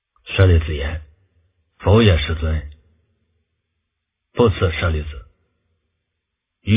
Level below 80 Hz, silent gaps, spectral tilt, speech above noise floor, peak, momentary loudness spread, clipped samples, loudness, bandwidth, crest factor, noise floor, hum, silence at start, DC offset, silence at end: -28 dBFS; none; -11 dB/octave; 62 dB; 0 dBFS; 19 LU; under 0.1%; -18 LUFS; 3.8 kHz; 20 dB; -78 dBFS; none; 0.25 s; under 0.1%; 0 s